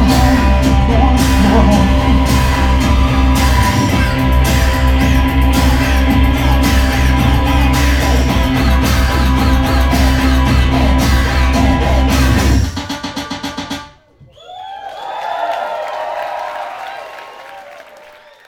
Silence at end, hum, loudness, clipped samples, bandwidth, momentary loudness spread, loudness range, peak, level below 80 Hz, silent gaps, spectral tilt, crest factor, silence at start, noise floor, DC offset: 0.65 s; none; -13 LUFS; under 0.1%; 17 kHz; 14 LU; 11 LU; 0 dBFS; -14 dBFS; none; -5.5 dB/octave; 12 dB; 0 s; -44 dBFS; under 0.1%